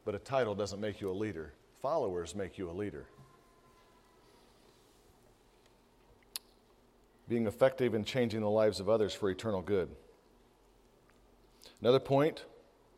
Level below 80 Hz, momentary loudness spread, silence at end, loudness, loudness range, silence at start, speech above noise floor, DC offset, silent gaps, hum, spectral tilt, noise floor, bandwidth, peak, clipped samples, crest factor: -66 dBFS; 16 LU; 0.5 s; -34 LUFS; 20 LU; 0.05 s; 32 dB; under 0.1%; none; none; -6 dB/octave; -65 dBFS; 15.5 kHz; -14 dBFS; under 0.1%; 22 dB